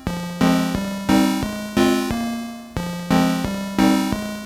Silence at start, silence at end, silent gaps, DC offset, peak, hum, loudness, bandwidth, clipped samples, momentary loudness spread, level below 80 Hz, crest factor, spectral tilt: 0 s; 0 s; none; under 0.1%; -2 dBFS; none; -21 LUFS; 17 kHz; under 0.1%; 10 LU; -40 dBFS; 18 dB; -5.5 dB/octave